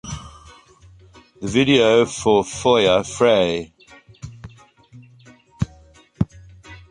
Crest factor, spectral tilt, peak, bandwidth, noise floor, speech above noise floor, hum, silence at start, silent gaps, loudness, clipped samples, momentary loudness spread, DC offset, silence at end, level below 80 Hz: 18 dB; -5 dB/octave; -2 dBFS; 11 kHz; -49 dBFS; 33 dB; none; 0.05 s; none; -18 LUFS; under 0.1%; 24 LU; under 0.1%; 0.15 s; -46 dBFS